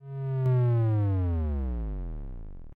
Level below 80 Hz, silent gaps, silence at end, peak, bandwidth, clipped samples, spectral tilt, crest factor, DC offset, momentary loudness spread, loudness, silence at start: -36 dBFS; none; 0.05 s; -20 dBFS; 3.5 kHz; under 0.1%; -11.5 dB/octave; 6 dB; under 0.1%; 17 LU; -28 LUFS; 0 s